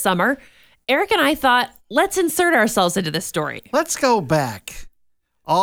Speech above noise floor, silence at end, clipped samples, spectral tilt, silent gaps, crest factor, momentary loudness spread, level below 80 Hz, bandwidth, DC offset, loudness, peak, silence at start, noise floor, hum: 45 dB; 0 s; under 0.1%; -3.5 dB/octave; none; 16 dB; 10 LU; -50 dBFS; over 20 kHz; under 0.1%; -19 LUFS; -4 dBFS; 0 s; -63 dBFS; none